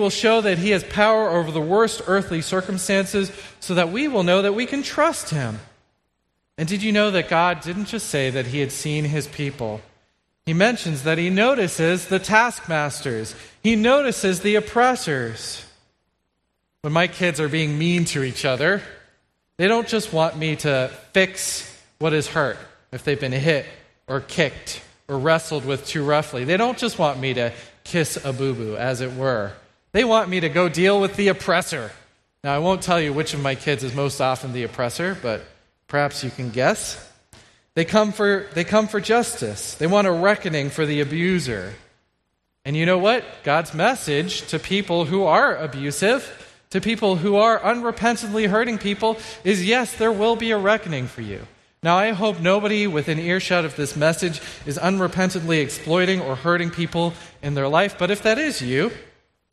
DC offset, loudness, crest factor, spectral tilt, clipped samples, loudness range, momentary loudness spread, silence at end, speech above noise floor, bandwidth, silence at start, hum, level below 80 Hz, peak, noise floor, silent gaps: under 0.1%; -21 LUFS; 20 dB; -4.5 dB/octave; under 0.1%; 4 LU; 10 LU; 0.5 s; 53 dB; 13.5 kHz; 0 s; none; -54 dBFS; 0 dBFS; -73 dBFS; none